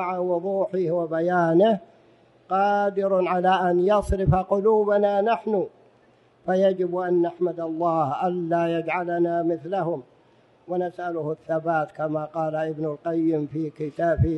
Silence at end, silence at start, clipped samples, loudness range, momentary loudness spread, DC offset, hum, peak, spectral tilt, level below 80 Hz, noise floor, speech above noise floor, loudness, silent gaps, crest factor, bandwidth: 0 s; 0 s; under 0.1%; 6 LU; 9 LU; under 0.1%; none; -6 dBFS; -8.5 dB/octave; -44 dBFS; -58 dBFS; 35 dB; -24 LUFS; none; 16 dB; 11.5 kHz